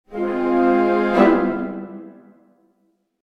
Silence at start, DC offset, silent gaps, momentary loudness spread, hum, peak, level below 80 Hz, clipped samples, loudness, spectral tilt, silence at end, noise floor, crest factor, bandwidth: 0.1 s; under 0.1%; none; 18 LU; none; -2 dBFS; -50 dBFS; under 0.1%; -18 LUFS; -8 dB/octave; 1.1 s; -66 dBFS; 18 dB; 6.2 kHz